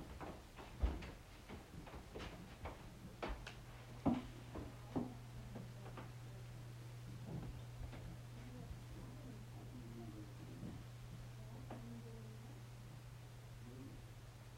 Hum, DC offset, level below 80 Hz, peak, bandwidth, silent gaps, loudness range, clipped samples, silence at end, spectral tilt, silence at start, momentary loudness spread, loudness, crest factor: none; under 0.1%; -56 dBFS; -24 dBFS; 16 kHz; none; 6 LU; under 0.1%; 0 s; -6.5 dB/octave; 0 s; 10 LU; -51 LUFS; 26 dB